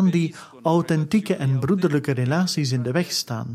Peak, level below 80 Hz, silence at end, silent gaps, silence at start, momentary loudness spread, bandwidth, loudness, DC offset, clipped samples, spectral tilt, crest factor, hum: -6 dBFS; -60 dBFS; 0 s; none; 0 s; 4 LU; 15 kHz; -22 LUFS; under 0.1%; under 0.1%; -6 dB/octave; 14 dB; none